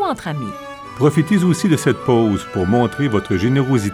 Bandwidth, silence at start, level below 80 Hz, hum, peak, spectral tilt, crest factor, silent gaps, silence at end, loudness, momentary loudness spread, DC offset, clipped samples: 14.5 kHz; 0 s; -46 dBFS; none; -2 dBFS; -6.5 dB/octave; 14 dB; none; 0 s; -17 LUFS; 10 LU; under 0.1%; under 0.1%